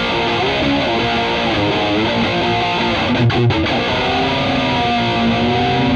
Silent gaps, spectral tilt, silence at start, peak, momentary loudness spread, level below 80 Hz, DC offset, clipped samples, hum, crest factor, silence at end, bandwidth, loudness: none; -6 dB/octave; 0 s; -6 dBFS; 1 LU; -36 dBFS; under 0.1%; under 0.1%; none; 10 dB; 0 s; 9 kHz; -16 LUFS